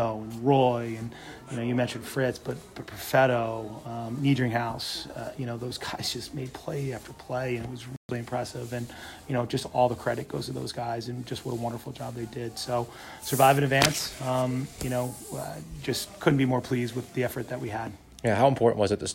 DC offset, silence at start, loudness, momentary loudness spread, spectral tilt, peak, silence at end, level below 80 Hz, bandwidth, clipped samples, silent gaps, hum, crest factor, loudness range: under 0.1%; 0 s; -29 LUFS; 15 LU; -5 dB/octave; -4 dBFS; 0 s; -56 dBFS; 16 kHz; under 0.1%; 7.97-8.09 s; none; 24 dB; 7 LU